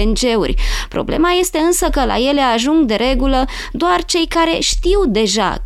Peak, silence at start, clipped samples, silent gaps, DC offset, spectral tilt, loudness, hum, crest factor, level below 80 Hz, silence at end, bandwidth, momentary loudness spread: -2 dBFS; 0 s; under 0.1%; none; under 0.1%; -3.5 dB/octave; -15 LUFS; none; 12 dB; -22 dBFS; 0 s; 15 kHz; 5 LU